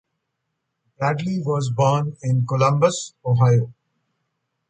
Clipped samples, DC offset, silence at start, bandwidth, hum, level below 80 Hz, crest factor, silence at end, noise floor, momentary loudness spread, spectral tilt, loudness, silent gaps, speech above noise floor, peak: under 0.1%; under 0.1%; 1 s; 9.2 kHz; none; -60 dBFS; 18 dB; 1 s; -77 dBFS; 7 LU; -6.5 dB/octave; -20 LUFS; none; 58 dB; -4 dBFS